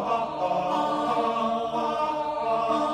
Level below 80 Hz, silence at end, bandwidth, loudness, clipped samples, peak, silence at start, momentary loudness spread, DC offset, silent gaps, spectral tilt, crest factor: -60 dBFS; 0 s; 11.5 kHz; -26 LUFS; under 0.1%; -14 dBFS; 0 s; 2 LU; under 0.1%; none; -5.5 dB/octave; 12 dB